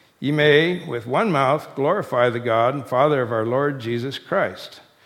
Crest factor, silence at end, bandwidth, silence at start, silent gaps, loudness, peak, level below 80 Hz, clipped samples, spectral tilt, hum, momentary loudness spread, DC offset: 18 dB; 0.25 s; 15.5 kHz; 0.2 s; none; -20 LUFS; -2 dBFS; -66 dBFS; under 0.1%; -6.5 dB/octave; none; 10 LU; under 0.1%